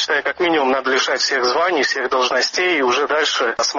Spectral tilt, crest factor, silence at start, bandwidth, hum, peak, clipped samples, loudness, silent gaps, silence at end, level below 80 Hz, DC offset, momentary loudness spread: 1 dB/octave; 12 dB; 0 s; 7.4 kHz; none; -6 dBFS; under 0.1%; -17 LUFS; none; 0 s; -60 dBFS; under 0.1%; 1 LU